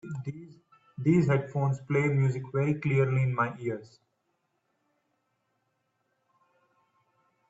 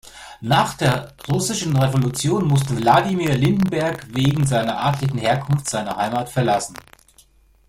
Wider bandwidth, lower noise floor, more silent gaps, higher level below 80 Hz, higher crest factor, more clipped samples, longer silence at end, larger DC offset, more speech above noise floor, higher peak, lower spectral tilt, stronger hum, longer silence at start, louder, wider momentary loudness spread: second, 7.8 kHz vs 16 kHz; first, -77 dBFS vs -54 dBFS; neither; second, -66 dBFS vs -48 dBFS; about the same, 18 dB vs 18 dB; neither; first, 3.65 s vs 0.9 s; neither; first, 50 dB vs 34 dB; second, -12 dBFS vs -2 dBFS; first, -9 dB/octave vs -5.5 dB/octave; neither; about the same, 0.05 s vs 0.05 s; second, -28 LUFS vs -20 LUFS; first, 14 LU vs 7 LU